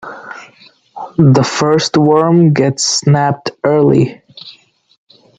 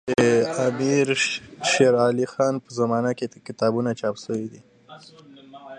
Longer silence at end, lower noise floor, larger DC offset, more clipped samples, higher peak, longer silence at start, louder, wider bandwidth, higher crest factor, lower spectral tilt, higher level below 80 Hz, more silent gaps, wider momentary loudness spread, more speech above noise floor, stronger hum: first, 0.9 s vs 0 s; about the same, -45 dBFS vs -43 dBFS; neither; neither; first, 0 dBFS vs -6 dBFS; about the same, 0.05 s vs 0.05 s; first, -11 LUFS vs -22 LUFS; second, 9.4 kHz vs 10.5 kHz; second, 12 dB vs 18 dB; about the same, -5.5 dB/octave vs -4.5 dB/octave; first, -52 dBFS vs -62 dBFS; neither; first, 21 LU vs 12 LU; first, 35 dB vs 20 dB; neither